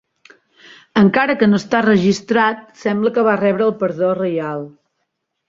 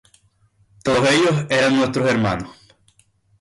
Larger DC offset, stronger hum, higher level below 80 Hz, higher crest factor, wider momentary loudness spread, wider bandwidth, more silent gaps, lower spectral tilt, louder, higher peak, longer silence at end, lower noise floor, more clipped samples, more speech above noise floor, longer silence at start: neither; neither; second, -56 dBFS vs -50 dBFS; about the same, 16 dB vs 14 dB; second, 9 LU vs 12 LU; second, 7.6 kHz vs 11.5 kHz; neither; first, -6.5 dB/octave vs -5 dB/octave; about the same, -16 LUFS vs -18 LUFS; first, -2 dBFS vs -8 dBFS; about the same, 0.8 s vs 0.9 s; first, -73 dBFS vs -59 dBFS; neither; first, 57 dB vs 42 dB; about the same, 0.95 s vs 0.85 s